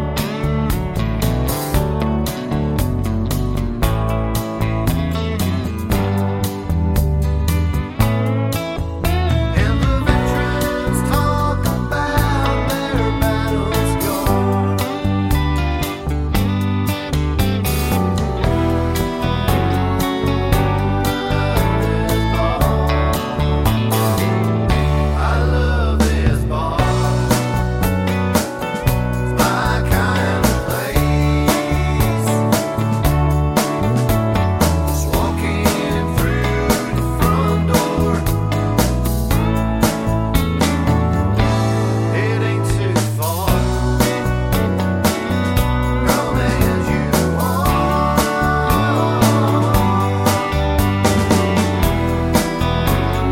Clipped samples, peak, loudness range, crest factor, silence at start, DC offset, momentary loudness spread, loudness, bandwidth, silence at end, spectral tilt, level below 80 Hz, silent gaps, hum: under 0.1%; 0 dBFS; 3 LU; 16 dB; 0 s; under 0.1%; 4 LU; -18 LUFS; 17 kHz; 0 s; -6 dB/octave; -24 dBFS; none; none